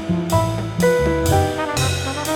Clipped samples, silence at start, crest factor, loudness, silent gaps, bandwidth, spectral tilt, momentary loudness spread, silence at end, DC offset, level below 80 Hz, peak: under 0.1%; 0 s; 14 dB; -19 LUFS; none; 19 kHz; -5 dB/octave; 4 LU; 0 s; under 0.1%; -34 dBFS; -4 dBFS